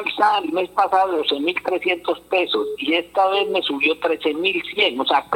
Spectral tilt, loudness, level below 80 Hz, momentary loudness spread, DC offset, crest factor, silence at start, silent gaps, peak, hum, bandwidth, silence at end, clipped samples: -3.5 dB/octave; -20 LUFS; -62 dBFS; 4 LU; under 0.1%; 16 dB; 0 s; none; -4 dBFS; 60 Hz at -60 dBFS; 17 kHz; 0 s; under 0.1%